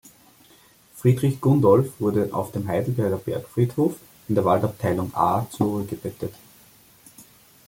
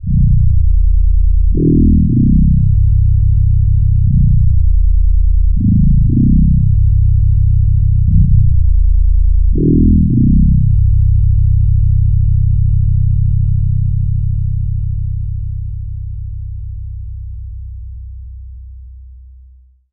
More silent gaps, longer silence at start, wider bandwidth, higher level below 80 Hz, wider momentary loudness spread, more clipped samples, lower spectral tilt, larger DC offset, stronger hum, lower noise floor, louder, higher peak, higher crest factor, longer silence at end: neither; first, 0.95 s vs 0.05 s; first, 17 kHz vs 0.5 kHz; second, -58 dBFS vs -14 dBFS; second, 11 LU vs 16 LU; neither; second, -8 dB/octave vs -18 dB/octave; second, under 0.1% vs 2%; neither; first, -54 dBFS vs -43 dBFS; second, -23 LUFS vs -13 LUFS; second, -4 dBFS vs 0 dBFS; first, 20 dB vs 10 dB; first, 0.45 s vs 0 s